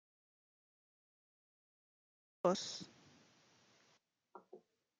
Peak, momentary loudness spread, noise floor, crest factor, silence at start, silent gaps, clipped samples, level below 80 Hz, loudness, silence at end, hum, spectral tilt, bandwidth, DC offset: -20 dBFS; 26 LU; -77 dBFS; 28 dB; 2.45 s; none; under 0.1%; under -90 dBFS; -40 LUFS; 0.4 s; none; -4.5 dB/octave; 9.4 kHz; under 0.1%